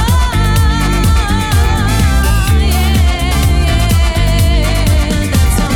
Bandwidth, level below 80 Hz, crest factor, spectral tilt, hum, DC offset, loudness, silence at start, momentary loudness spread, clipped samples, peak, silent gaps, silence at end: 18.5 kHz; -12 dBFS; 8 dB; -5 dB/octave; none; under 0.1%; -12 LUFS; 0 s; 1 LU; under 0.1%; -2 dBFS; none; 0 s